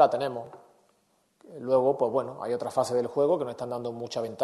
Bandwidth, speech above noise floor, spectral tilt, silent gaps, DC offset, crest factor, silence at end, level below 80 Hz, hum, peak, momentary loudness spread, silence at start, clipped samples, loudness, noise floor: 12.5 kHz; 42 dB; -6 dB/octave; none; under 0.1%; 22 dB; 0 s; -72 dBFS; none; -6 dBFS; 14 LU; 0 s; under 0.1%; -28 LUFS; -69 dBFS